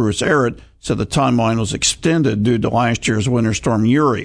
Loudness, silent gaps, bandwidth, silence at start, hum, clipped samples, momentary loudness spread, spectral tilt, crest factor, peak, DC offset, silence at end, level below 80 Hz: -17 LUFS; none; 11 kHz; 0 s; none; under 0.1%; 5 LU; -5 dB/octave; 14 dB; -2 dBFS; under 0.1%; 0 s; -40 dBFS